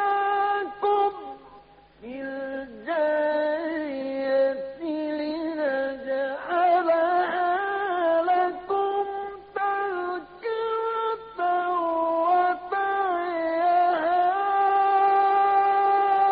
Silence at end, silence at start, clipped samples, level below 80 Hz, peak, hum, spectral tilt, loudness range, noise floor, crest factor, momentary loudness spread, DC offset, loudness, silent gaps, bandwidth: 0 s; 0 s; under 0.1%; -64 dBFS; -12 dBFS; none; -1 dB/octave; 5 LU; -52 dBFS; 12 dB; 11 LU; under 0.1%; -24 LUFS; none; 5 kHz